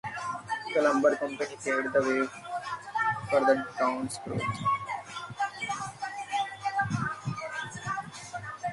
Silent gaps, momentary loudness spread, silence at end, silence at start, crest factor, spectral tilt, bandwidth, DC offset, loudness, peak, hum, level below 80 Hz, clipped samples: none; 11 LU; 0 s; 0.05 s; 20 dB; -5 dB/octave; 11.5 kHz; under 0.1%; -30 LUFS; -12 dBFS; none; -64 dBFS; under 0.1%